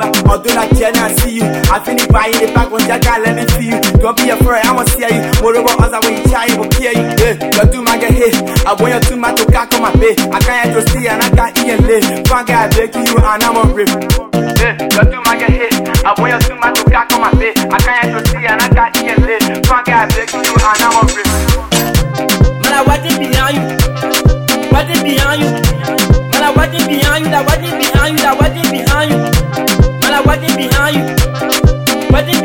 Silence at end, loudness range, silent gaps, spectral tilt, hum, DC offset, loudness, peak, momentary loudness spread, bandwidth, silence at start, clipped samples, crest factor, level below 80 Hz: 0 s; 1 LU; none; -4.5 dB/octave; none; 0.3%; -11 LUFS; 0 dBFS; 3 LU; 19 kHz; 0 s; under 0.1%; 10 dB; -18 dBFS